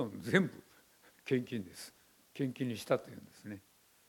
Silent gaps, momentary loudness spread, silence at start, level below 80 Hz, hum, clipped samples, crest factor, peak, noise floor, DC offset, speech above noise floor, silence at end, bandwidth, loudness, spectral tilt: none; 20 LU; 0 s; -78 dBFS; none; under 0.1%; 26 dB; -12 dBFS; -65 dBFS; under 0.1%; 29 dB; 0.5 s; 17.5 kHz; -36 LUFS; -6 dB/octave